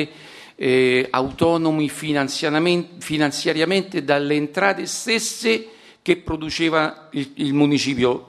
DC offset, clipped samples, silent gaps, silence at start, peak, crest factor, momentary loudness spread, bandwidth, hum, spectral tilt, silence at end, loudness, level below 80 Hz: under 0.1%; under 0.1%; none; 0 s; 0 dBFS; 20 dB; 8 LU; 13 kHz; none; -4.5 dB/octave; 0.05 s; -20 LUFS; -52 dBFS